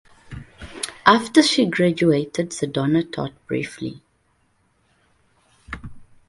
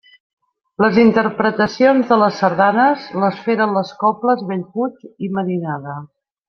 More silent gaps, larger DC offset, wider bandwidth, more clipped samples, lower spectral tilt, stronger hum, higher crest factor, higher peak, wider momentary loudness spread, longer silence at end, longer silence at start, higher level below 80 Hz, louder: neither; neither; first, 11.5 kHz vs 6.6 kHz; neither; second, -5 dB/octave vs -7 dB/octave; neither; first, 22 dB vs 16 dB; about the same, 0 dBFS vs -2 dBFS; first, 23 LU vs 12 LU; second, 0.25 s vs 0.4 s; second, 0.3 s vs 0.8 s; first, -50 dBFS vs -58 dBFS; second, -20 LUFS vs -16 LUFS